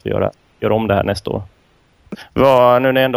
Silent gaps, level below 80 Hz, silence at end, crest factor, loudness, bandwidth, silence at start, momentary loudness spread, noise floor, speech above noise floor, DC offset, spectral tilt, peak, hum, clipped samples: none; -42 dBFS; 0 s; 16 dB; -15 LUFS; 16.5 kHz; 0.05 s; 15 LU; -55 dBFS; 40 dB; under 0.1%; -6.5 dB/octave; 0 dBFS; none; under 0.1%